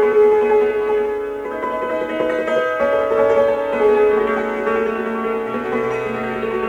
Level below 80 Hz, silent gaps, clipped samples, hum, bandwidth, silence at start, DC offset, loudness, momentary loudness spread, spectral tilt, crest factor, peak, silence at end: -50 dBFS; none; under 0.1%; none; 7.6 kHz; 0 s; under 0.1%; -18 LUFS; 8 LU; -6 dB/octave; 12 dB; -6 dBFS; 0 s